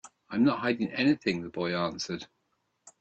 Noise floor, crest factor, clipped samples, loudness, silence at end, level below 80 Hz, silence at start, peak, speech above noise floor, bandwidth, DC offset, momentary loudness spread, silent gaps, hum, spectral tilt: -77 dBFS; 18 dB; under 0.1%; -29 LUFS; 0.1 s; -68 dBFS; 0.05 s; -12 dBFS; 48 dB; 8.6 kHz; under 0.1%; 10 LU; none; none; -5.5 dB/octave